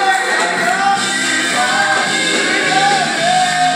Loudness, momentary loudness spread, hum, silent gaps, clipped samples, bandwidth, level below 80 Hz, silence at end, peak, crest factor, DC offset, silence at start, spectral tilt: -13 LUFS; 2 LU; none; none; under 0.1%; 16.5 kHz; -64 dBFS; 0 s; -2 dBFS; 12 dB; under 0.1%; 0 s; -1.5 dB/octave